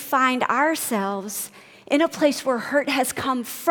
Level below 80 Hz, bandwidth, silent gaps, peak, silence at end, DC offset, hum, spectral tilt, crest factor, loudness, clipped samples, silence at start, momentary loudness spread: -66 dBFS; 19 kHz; none; -4 dBFS; 0 s; under 0.1%; none; -3 dB/octave; 18 dB; -22 LUFS; under 0.1%; 0 s; 8 LU